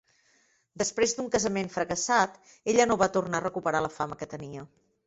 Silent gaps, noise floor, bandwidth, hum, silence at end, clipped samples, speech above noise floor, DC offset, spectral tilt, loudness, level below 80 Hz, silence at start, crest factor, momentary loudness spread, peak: none; -67 dBFS; 8.2 kHz; none; 0.4 s; under 0.1%; 39 dB; under 0.1%; -3.5 dB/octave; -28 LUFS; -60 dBFS; 0.75 s; 20 dB; 14 LU; -8 dBFS